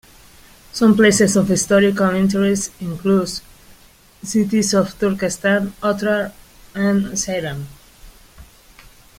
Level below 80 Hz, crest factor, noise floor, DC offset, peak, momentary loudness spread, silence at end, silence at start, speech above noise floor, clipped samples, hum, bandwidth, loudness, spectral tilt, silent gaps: -48 dBFS; 18 dB; -48 dBFS; under 0.1%; -2 dBFS; 15 LU; 0.75 s; 0.75 s; 32 dB; under 0.1%; none; 16 kHz; -17 LUFS; -4.5 dB/octave; none